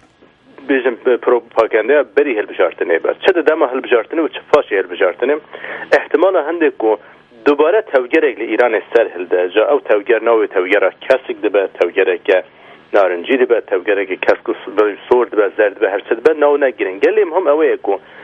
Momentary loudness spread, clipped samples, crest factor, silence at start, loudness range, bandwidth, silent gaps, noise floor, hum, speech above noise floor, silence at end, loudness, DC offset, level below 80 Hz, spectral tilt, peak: 5 LU; under 0.1%; 14 dB; 0.6 s; 1 LU; 7 kHz; none; -48 dBFS; none; 34 dB; 0 s; -15 LUFS; under 0.1%; -62 dBFS; -5 dB/octave; 0 dBFS